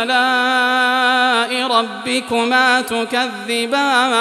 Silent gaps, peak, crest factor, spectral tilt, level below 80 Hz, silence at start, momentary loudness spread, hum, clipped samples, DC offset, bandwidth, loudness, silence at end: none; -2 dBFS; 14 dB; -1.5 dB/octave; -64 dBFS; 0 s; 6 LU; none; under 0.1%; under 0.1%; 14 kHz; -15 LUFS; 0 s